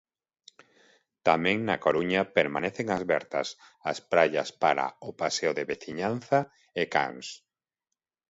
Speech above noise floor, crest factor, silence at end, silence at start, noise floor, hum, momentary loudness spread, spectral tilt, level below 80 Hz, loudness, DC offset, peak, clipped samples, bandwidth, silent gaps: 60 dB; 22 dB; 0.95 s; 1.25 s; -88 dBFS; none; 10 LU; -4.5 dB/octave; -66 dBFS; -28 LUFS; under 0.1%; -6 dBFS; under 0.1%; 8 kHz; none